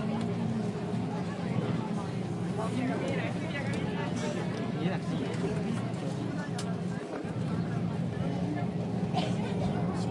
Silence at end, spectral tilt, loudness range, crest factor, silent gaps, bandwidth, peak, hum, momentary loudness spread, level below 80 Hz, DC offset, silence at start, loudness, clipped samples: 0 s; -7 dB/octave; 1 LU; 14 dB; none; 11.5 kHz; -16 dBFS; none; 3 LU; -60 dBFS; under 0.1%; 0 s; -33 LUFS; under 0.1%